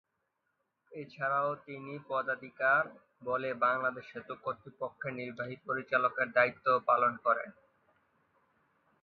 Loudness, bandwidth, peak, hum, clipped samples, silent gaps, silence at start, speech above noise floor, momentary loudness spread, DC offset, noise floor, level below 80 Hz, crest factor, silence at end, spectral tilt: -32 LUFS; 6.2 kHz; -12 dBFS; none; under 0.1%; none; 0.9 s; 49 dB; 16 LU; under 0.1%; -82 dBFS; -80 dBFS; 24 dB; 1.5 s; -3 dB/octave